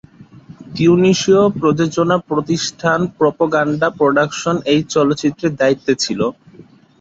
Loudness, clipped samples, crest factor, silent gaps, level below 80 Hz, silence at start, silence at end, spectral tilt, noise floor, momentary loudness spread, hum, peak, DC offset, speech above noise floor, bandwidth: -15 LUFS; under 0.1%; 14 dB; none; -52 dBFS; 0.2 s; 0.4 s; -5.5 dB/octave; -44 dBFS; 7 LU; none; -2 dBFS; under 0.1%; 29 dB; 8 kHz